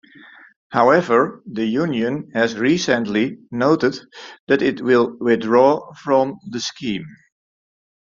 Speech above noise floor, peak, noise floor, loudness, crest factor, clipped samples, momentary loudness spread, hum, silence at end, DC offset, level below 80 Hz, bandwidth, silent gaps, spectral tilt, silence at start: 27 dB; -2 dBFS; -45 dBFS; -19 LUFS; 18 dB; under 0.1%; 12 LU; none; 1.1 s; under 0.1%; -60 dBFS; 7.6 kHz; 4.40-4.47 s; -5.5 dB/octave; 0.7 s